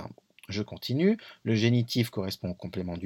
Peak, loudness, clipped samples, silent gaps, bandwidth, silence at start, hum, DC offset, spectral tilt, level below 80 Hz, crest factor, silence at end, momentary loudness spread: -12 dBFS; -29 LUFS; under 0.1%; none; 17.5 kHz; 0 s; none; under 0.1%; -6.5 dB/octave; -62 dBFS; 18 dB; 0 s; 11 LU